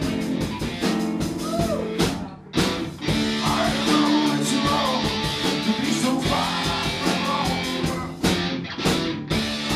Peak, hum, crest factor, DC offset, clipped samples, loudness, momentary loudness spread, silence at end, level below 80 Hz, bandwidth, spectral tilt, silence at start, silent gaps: -6 dBFS; none; 18 dB; under 0.1%; under 0.1%; -23 LUFS; 6 LU; 0 s; -42 dBFS; 15.5 kHz; -4.5 dB/octave; 0 s; none